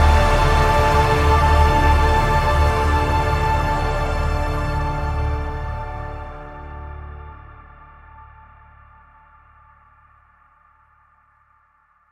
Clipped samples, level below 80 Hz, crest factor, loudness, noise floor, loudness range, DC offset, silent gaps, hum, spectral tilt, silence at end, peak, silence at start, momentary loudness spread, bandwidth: under 0.1%; -24 dBFS; 18 dB; -19 LUFS; -59 dBFS; 22 LU; under 0.1%; none; none; -6 dB/octave; 3.9 s; -2 dBFS; 0 s; 20 LU; 15 kHz